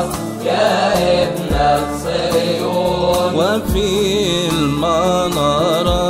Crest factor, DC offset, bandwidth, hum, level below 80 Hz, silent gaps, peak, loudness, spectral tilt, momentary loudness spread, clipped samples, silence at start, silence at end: 14 dB; 0.2%; 16 kHz; none; -30 dBFS; none; -2 dBFS; -16 LUFS; -5 dB/octave; 4 LU; under 0.1%; 0 s; 0 s